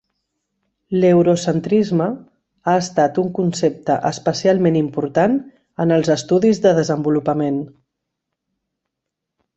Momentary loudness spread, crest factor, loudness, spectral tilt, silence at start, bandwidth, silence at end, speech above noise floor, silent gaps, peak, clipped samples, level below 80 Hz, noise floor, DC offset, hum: 9 LU; 16 dB; -18 LUFS; -6.5 dB/octave; 0.9 s; 8.2 kHz; 1.9 s; 64 dB; none; -2 dBFS; under 0.1%; -58 dBFS; -80 dBFS; under 0.1%; none